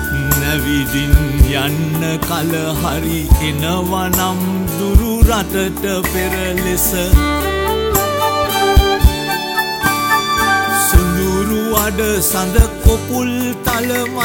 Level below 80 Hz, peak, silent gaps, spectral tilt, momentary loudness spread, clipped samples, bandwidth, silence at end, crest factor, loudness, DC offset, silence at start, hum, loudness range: -18 dBFS; 0 dBFS; none; -4.5 dB/octave; 5 LU; under 0.1%; 17 kHz; 0 s; 14 dB; -15 LUFS; under 0.1%; 0 s; none; 2 LU